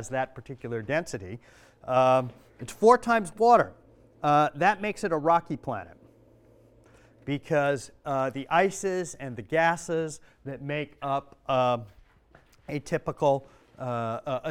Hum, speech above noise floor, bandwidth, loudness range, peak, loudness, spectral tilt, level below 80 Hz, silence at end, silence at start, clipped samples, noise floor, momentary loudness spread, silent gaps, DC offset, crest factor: none; 32 dB; 15.5 kHz; 6 LU; -6 dBFS; -27 LUFS; -5.5 dB/octave; -60 dBFS; 0 s; 0 s; under 0.1%; -59 dBFS; 17 LU; none; under 0.1%; 22 dB